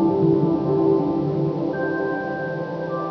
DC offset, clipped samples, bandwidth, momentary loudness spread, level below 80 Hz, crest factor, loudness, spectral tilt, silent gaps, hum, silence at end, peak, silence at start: under 0.1%; under 0.1%; 5.4 kHz; 8 LU; -52 dBFS; 14 dB; -22 LUFS; -10 dB/octave; none; none; 0 s; -8 dBFS; 0 s